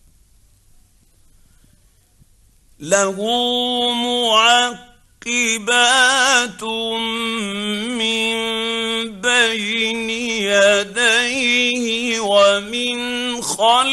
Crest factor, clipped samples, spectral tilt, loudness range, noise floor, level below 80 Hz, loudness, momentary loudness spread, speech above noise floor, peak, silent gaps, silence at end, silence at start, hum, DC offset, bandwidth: 16 dB; under 0.1%; -1 dB/octave; 6 LU; -54 dBFS; -54 dBFS; -16 LUFS; 9 LU; 37 dB; -2 dBFS; none; 0 s; 2.8 s; none; under 0.1%; 12.5 kHz